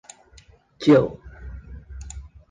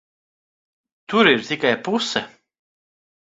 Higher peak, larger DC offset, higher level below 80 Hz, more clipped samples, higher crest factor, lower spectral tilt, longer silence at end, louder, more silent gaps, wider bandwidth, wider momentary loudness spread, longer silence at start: second, -4 dBFS vs 0 dBFS; neither; first, -42 dBFS vs -64 dBFS; neither; about the same, 20 dB vs 24 dB; first, -7 dB/octave vs -4 dB/octave; second, 0.3 s vs 1 s; about the same, -19 LUFS vs -19 LUFS; neither; first, 9.6 kHz vs 7.8 kHz; first, 24 LU vs 10 LU; second, 0.8 s vs 1.1 s